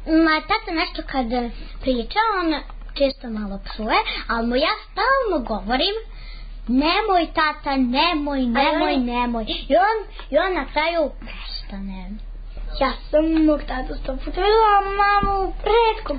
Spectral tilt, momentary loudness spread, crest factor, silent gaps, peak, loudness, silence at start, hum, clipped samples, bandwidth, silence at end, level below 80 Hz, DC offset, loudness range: -9.5 dB/octave; 14 LU; 16 dB; none; -6 dBFS; -21 LUFS; 0 s; none; under 0.1%; 5 kHz; 0 s; -34 dBFS; under 0.1%; 4 LU